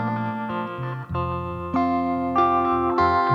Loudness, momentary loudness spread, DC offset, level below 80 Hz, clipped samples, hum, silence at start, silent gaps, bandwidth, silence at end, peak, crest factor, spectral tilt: -23 LUFS; 9 LU; under 0.1%; -46 dBFS; under 0.1%; none; 0 s; none; 7.2 kHz; 0 s; -8 dBFS; 14 dB; -8.5 dB/octave